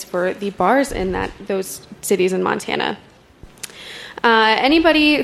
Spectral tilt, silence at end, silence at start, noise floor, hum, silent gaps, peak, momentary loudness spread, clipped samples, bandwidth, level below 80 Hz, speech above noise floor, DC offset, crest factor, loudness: -4 dB/octave; 0 s; 0 s; -44 dBFS; none; none; -2 dBFS; 19 LU; under 0.1%; 15 kHz; -42 dBFS; 27 dB; under 0.1%; 18 dB; -17 LUFS